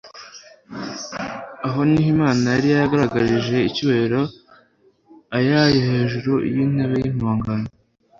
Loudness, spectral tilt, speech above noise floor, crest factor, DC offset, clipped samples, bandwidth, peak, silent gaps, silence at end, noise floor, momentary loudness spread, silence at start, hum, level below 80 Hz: -20 LUFS; -6.5 dB/octave; 39 dB; 16 dB; under 0.1%; under 0.1%; 7.6 kHz; -4 dBFS; none; 0.5 s; -57 dBFS; 14 LU; 0.05 s; none; -48 dBFS